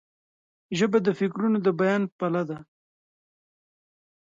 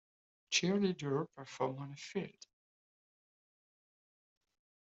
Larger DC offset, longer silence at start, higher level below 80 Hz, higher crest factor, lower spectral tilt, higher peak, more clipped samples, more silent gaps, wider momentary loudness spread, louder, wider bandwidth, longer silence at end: neither; first, 0.7 s vs 0.5 s; first, -72 dBFS vs -82 dBFS; about the same, 18 dB vs 22 dB; first, -6.5 dB/octave vs -4 dB/octave; first, -10 dBFS vs -18 dBFS; neither; first, 2.12-2.19 s vs none; second, 10 LU vs 13 LU; first, -25 LUFS vs -37 LUFS; about the same, 7.6 kHz vs 8 kHz; second, 1.65 s vs 2.5 s